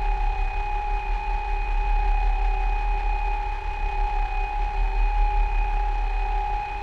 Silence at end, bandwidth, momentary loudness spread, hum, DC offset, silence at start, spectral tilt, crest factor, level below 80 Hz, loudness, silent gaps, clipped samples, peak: 0 s; 5.2 kHz; 3 LU; none; under 0.1%; 0 s; -6 dB/octave; 12 dB; -24 dBFS; -28 LUFS; none; under 0.1%; -12 dBFS